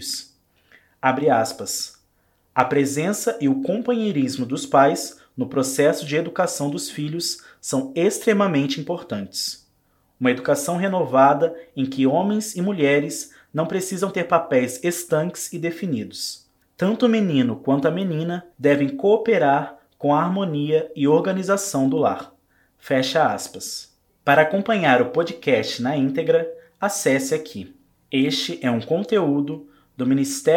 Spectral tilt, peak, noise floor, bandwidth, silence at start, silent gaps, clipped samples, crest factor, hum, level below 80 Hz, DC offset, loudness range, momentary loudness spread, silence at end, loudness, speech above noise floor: -5 dB/octave; 0 dBFS; -64 dBFS; 17 kHz; 0 s; none; under 0.1%; 22 dB; none; -68 dBFS; under 0.1%; 3 LU; 11 LU; 0 s; -21 LUFS; 43 dB